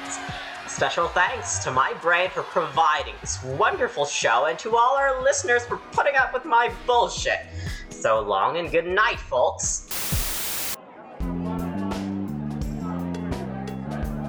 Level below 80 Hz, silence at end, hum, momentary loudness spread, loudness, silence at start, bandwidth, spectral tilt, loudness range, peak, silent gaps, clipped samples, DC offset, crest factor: -42 dBFS; 0 s; none; 11 LU; -24 LUFS; 0 s; over 20 kHz; -3.5 dB/octave; 7 LU; -8 dBFS; none; under 0.1%; under 0.1%; 16 dB